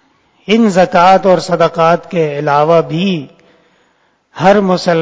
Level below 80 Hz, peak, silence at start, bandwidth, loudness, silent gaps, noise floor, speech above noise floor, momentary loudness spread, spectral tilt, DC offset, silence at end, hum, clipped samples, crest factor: -52 dBFS; 0 dBFS; 0.5 s; 8 kHz; -11 LUFS; none; -56 dBFS; 46 dB; 8 LU; -6 dB/octave; under 0.1%; 0 s; none; 0.5%; 12 dB